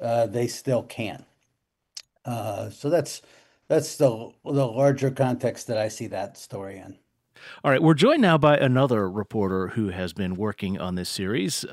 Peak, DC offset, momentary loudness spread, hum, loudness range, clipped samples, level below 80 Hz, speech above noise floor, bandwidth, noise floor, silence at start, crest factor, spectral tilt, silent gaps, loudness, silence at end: -6 dBFS; under 0.1%; 18 LU; none; 7 LU; under 0.1%; -62 dBFS; 53 dB; 16 kHz; -77 dBFS; 0 s; 18 dB; -6 dB/octave; none; -24 LUFS; 0 s